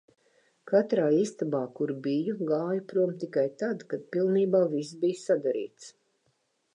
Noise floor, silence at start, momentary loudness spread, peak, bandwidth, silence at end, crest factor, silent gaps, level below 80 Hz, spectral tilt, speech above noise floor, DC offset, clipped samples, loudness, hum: -73 dBFS; 0.65 s; 8 LU; -12 dBFS; 10.5 kHz; 0.85 s; 18 dB; none; -84 dBFS; -7 dB/octave; 46 dB; under 0.1%; under 0.1%; -28 LUFS; none